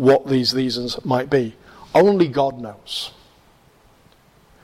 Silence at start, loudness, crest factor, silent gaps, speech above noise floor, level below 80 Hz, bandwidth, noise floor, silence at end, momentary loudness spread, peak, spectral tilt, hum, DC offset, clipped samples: 0 s; -19 LUFS; 14 dB; none; 35 dB; -54 dBFS; 15 kHz; -54 dBFS; 1.55 s; 13 LU; -6 dBFS; -6 dB/octave; none; under 0.1%; under 0.1%